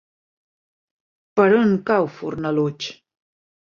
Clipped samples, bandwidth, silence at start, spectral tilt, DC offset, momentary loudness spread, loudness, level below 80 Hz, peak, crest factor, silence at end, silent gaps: under 0.1%; 7.2 kHz; 1.35 s; -7 dB/octave; under 0.1%; 13 LU; -20 LUFS; -62 dBFS; -2 dBFS; 20 dB; 0.85 s; none